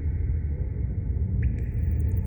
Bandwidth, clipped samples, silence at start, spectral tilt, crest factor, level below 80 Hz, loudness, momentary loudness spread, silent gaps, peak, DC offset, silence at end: 17 kHz; under 0.1%; 0 s; -11 dB/octave; 10 dB; -28 dBFS; -28 LUFS; 3 LU; none; -16 dBFS; under 0.1%; 0 s